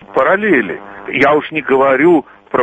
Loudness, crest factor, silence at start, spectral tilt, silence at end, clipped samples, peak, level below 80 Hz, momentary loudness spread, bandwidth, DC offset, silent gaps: -13 LUFS; 12 dB; 0.1 s; -7 dB/octave; 0 s; under 0.1%; 0 dBFS; -52 dBFS; 10 LU; 8 kHz; under 0.1%; none